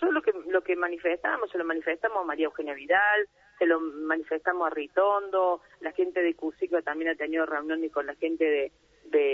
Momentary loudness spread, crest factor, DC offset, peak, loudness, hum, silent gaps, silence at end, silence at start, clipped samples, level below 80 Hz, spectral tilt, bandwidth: 6 LU; 16 dB; under 0.1%; -12 dBFS; -28 LUFS; none; none; 0 s; 0 s; under 0.1%; -70 dBFS; -5 dB/octave; 5.8 kHz